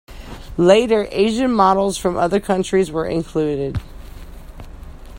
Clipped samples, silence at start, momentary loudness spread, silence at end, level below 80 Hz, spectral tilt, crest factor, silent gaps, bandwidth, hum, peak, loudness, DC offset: under 0.1%; 0.1 s; 13 LU; 0 s; -38 dBFS; -5.5 dB/octave; 18 dB; none; 16.5 kHz; none; 0 dBFS; -17 LUFS; under 0.1%